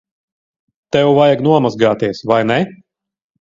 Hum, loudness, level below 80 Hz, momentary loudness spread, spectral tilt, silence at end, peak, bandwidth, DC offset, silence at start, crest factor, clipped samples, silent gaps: none; -14 LUFS; -54 dBFS; 8 LU; -7 dB/octave; 0.7 s; 0 dBFS; 7.6 kHz; under 0.1%; 0.95 s; 16 dB; under 0.1%; none